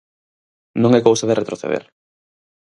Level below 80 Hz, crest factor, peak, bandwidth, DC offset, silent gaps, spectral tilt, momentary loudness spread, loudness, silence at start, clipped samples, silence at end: -62 dBFS; 20 dB; 0 dBFS; 11.5 kHz; under 0.1%; none; -5.5 dB/octave; 12 LU; -17 LUFS; 0.75 s; under 0.1%; 0.8 s